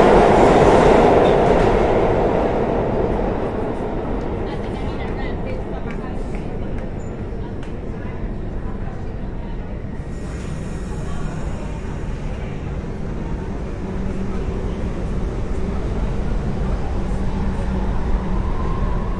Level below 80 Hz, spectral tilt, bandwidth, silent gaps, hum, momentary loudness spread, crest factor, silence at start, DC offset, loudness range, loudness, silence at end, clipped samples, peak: -26 dBFS; -7.5 dB/octave; 11 kHz; none; none; 16 LU; 20 dB; 0 s; under 0.1%; 12 LU; -21 LUFS; 0 s; under 0.1%; 0 dBFS